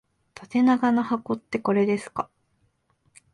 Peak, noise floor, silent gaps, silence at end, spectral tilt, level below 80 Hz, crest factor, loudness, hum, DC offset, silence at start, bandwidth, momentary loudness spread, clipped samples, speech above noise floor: -10 dBFS; -69 dBFS; none; 1.1 s; -7 dB/octave; -66 dBFS; 16 dB; -24 LUFS; none; under 0.1%; 0.4 s; 11 kHz; 13 LU; under 0.1%; 46 dB